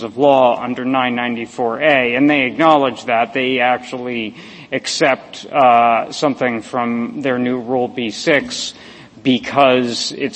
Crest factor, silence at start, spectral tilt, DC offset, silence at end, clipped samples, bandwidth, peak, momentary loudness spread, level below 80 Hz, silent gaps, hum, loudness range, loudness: 16 dB; 0 s; -4 dB/octave; under 0.1%; 0 s; under 0.1%; 8.8 kHz; 0 dBFS; 10 LU; -58 dBFS; none; none; 3 LU; -16 LUFS